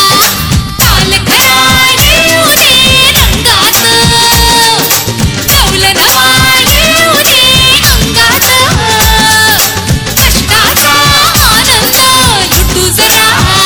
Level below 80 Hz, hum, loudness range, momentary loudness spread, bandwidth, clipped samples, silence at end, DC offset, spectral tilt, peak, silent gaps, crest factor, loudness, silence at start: -18 dBFS; none; 1 LU; 4 LU; over 20 kHz; 4%; 0 s; 0.8%; -2 dB/octave; 0 dBFS; none; 6 dB; -4 LUFS; 0 s